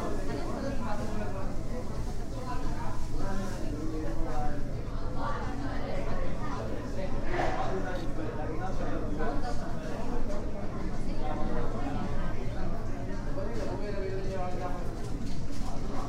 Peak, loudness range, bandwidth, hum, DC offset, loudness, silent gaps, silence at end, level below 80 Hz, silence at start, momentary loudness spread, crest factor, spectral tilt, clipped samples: -16 dBFS; 2 LU; 8.4 kHz; none; under 0.1%; -36 LUFS; none; 0 s; -32 dBFS; 0 s; 4 LU; 12 dB; -6.5 dB/octave; under 0.1%